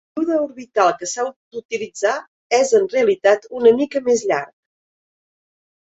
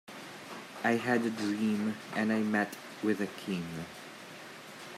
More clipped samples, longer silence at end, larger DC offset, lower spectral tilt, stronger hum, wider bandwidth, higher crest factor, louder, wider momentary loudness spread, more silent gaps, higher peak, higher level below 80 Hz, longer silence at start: neither; first, 1.45 s vs 0 s; neither; second, -3 dB/octave vs -5.5 dB/octave; neither; second, 8.2 kHz vs 15.5 kHz; about the same, 18 dB vs 18 dB; first, -19 LUFS vs -32 LUFS; second, 12 LU vs 17 LU; first, 1.36-1.51 s, 1.65-1.69 s, 2.28-2.50 s vs none; first, -2 dBFS vs -16 dBFS; first, -66 dBFS vs -76 dBFS; about the same, 0.15 s vs 0.05 s